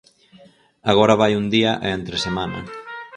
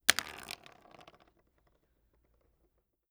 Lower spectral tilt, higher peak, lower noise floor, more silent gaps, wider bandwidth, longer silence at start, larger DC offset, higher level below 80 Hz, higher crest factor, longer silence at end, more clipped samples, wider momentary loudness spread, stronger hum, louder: first, -5.5 dB/octave vs 1 dB/octave; about the same, 0 dBFS vs 0 dBFS; second, -50 dBFS vs -76 dBFS; neither; second, 10.5 kHz vs over 20 kHz; first, 0.85 s vs 0.1 s; neither; first, -48 dBFS vs -70 dBFS; second, 20 dB vs 40 dB; second, 0 s vs 2.6 s; neither; second, 16 LU vs 25 LU; neither; first, -19 LUFS vs -36 LUFS